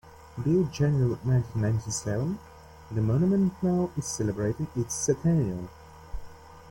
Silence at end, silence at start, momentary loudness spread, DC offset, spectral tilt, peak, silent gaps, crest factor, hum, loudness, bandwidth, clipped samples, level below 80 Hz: 0 s; 0.05 s; 15 LU; under 0.1%; -6.5 dB/octave; -12 dBFS; none; 16 dB; none; -27 LUFS; 17 kHz; under 0.1%; -48 dBFS